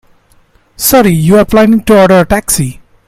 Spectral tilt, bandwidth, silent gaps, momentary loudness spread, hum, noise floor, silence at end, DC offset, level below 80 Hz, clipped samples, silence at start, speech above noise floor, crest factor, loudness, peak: -5 dB/octave; 16.5 kHz; none; 7 LU; none; -47 dBFS; 0.35 s; under 0.1%; -30 dBFS; 0.4%; 0.8 s; 41 dB; 8 dB; -7 LUFS; 0 dBFS